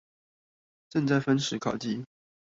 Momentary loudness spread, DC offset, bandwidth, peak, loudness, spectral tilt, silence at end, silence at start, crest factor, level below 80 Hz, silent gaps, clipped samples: 11 LU; under 0.1%; 7.8 kHz; -12 dBFS; -29 LUFS; -5.5 dB/octave; 0.5 s; 0.95 s; 18 dB; -68 dBFS; none; under 0.1%